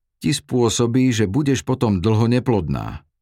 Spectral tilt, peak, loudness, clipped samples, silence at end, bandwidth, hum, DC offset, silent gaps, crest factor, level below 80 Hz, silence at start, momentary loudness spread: -6 dB/octave; -4 dBFS; -19 LUFS; under 0.1%; 0.25 s; 15 kHz; none; under 0.1%; none; 14 dB; -42 dBFS; 0.2 s; 6 LU